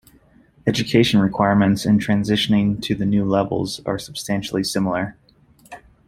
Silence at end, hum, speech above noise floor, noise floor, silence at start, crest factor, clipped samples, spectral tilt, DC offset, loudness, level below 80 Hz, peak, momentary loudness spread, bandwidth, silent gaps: 0.3 s; none; 34 dB; -53 dBFS; 0.65 s; 18 dB; under 0.1%; -5.5 dB/octave; under 0.1%; -19 LUFS; -48 dBFS; -2 dBFS; 9 LU; 14.5 kHz; none